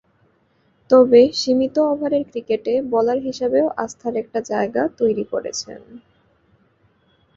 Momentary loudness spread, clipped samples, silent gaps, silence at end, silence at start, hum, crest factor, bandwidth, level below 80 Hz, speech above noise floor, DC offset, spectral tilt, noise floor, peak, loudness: 13 LU; under 0.1%; none; 1.4 s; 0.9 s; none; 18 dB; 7.8 kHz; -60 dBFS; 43 dB; under 0.1%; -4.5 dB/octave; -61 dBFS; -2 dBFS; -19 LUFS